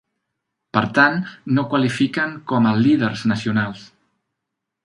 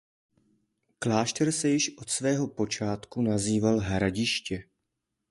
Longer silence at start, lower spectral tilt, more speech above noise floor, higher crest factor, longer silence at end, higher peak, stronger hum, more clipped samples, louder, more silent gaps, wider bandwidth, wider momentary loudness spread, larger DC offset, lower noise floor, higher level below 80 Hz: second, 0.75 s vs 1 s; first, -6.5 dB/octave vs -4.5 dB/octave; first, 62 dB vs 55 dB; about the same, 20 dB vs 20 dB; first, 1 s vs 0.7 s; first, 0 dBFS vs -10 dBFS; neither; neither; first, -19 LUFS vs -28 LUFS; neither; about the same, 11.5 kHz vs 11.5 kHz; about the same, 8 LU vs 6 LU; neither; about the same, -81 dBFS vs -83 dBFS; about the same, -58 dBFS vs -54 dBFS